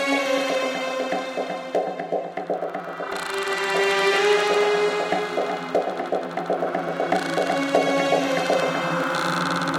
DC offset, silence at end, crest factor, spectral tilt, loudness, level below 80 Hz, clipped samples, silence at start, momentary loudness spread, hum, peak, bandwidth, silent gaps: under 0.1%; 0 s; 18 dB; -4 dB/octave; -23 LUFS; -68 dBFS; under 0.1%; 0 s; 9 LU; none; -6 dBFS; 17 kHz; none